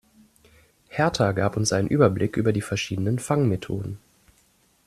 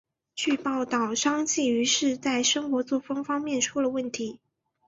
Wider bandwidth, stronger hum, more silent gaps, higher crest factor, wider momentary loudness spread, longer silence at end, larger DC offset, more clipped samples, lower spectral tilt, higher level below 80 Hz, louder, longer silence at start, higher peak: first, 14 kHz vs 8 kHz; neither; neither; about the same, 20 dB vs 18 dB; first, 11 LU vs 7 LU; first, 0.9 s vs 0.5 s; neither; neither; first, -5.5 dB/octave vs -1.5 dB/octave; first, -54 dBFS vs -70 dBFS; about the same, -24 LUFS vs -26 LUFS; first, 0.9 s vs 0.35 s; first, -6 dBFS vs -10 dBFS